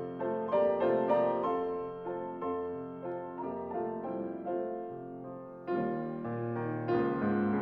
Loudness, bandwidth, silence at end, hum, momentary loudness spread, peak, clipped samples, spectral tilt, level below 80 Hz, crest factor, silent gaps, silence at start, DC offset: -34 LUFS; 5 kHz; 0 s; none; 11 LU; -16 dBFS; under 0.1%; -10 dB/octave; -70 dBFS; 18 dB; none; 0 s; under 0.1%